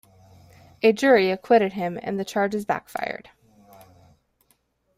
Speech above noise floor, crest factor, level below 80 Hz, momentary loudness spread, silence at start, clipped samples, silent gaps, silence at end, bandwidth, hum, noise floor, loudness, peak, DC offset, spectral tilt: 45 dB; 20 dB; -64 dBFS; 13 LU; 0.85 s; under 0.1%; none; 1.8 s; 15.5 kHz; none; -67 dBFS; -22 LUFS; -4 dBFS; under 0.1%; -5.5 dB/octave